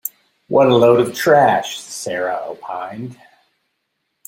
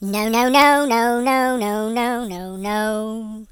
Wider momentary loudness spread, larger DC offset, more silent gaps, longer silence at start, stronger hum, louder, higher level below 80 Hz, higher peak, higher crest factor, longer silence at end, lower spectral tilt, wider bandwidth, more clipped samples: first, 18 LU vs 15 LU; neither; neither; about the same, 0.05 s vs 0 s; neither; about the same, -16 LUFS vs -18 LUFS; second, -60 dBFS vs -52 dBFS; about the same, -2 dBFS vs 0 dBFS; about the same, 16 dB vs 18 dB; first, 1.15 s vs 0.05 s; about the same, -5 dB/octave vs -4 dB/octave; second, 16.5 kHz vs over 20 kHz; neither